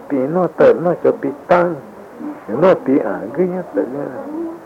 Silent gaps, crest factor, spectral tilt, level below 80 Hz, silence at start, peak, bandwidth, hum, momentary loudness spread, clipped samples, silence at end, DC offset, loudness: none; 14 dB; -8.5 dB/octave; -56 dBFS; 0 s; -2 dBFS; 7.6 kHz; none; 16 LU; under 0.1%; 0 s; under 0.1%; -17 LUFS